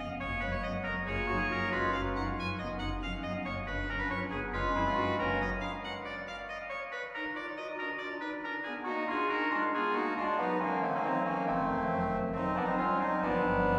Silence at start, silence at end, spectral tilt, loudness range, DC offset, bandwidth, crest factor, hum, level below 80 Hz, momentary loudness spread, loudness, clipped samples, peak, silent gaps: 0 s; 0 s; -7 dB/octave; 5 LU; under 0.1%; 9.6 kHz; 14 dB; none; -46 dBFS; 7 LU; -33 LUFS; under 0.1%; -18 dBFS; none